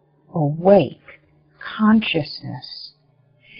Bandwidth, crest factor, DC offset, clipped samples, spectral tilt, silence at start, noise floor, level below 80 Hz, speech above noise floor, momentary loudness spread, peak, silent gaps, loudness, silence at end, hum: 5.6 kHz; 20 dB; under 0.1%; under 0.1%; -5.5 dB/octave; 0.35 s; -58 dBFS; -56 dBFS; 40 dB; 20 LU; -2 dBFS; none; -18 LUFS; 0 s; none